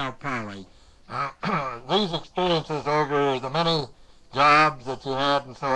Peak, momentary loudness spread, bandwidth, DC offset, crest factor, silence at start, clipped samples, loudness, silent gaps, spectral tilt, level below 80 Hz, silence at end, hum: -6 dBFS; 15 LU; 11 kHz; under 0.1%; 18 dB; 0 s; under 0.1%; -24 LUFS; none; -5 dB/octave; -52 dBFS; 0 s; none